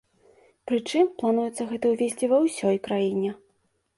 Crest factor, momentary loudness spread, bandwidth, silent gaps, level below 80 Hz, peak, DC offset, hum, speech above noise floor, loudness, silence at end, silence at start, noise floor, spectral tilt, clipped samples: 16 dB; 7 LU; 11.5 kHz; none; -68 dBFS; -10 dBFS; under 0.1%; none; 46 dB; -25 LUFS; 0.6 s; 0.65 s; -70 dBFS; -5.5 dB/octave; under 0.1%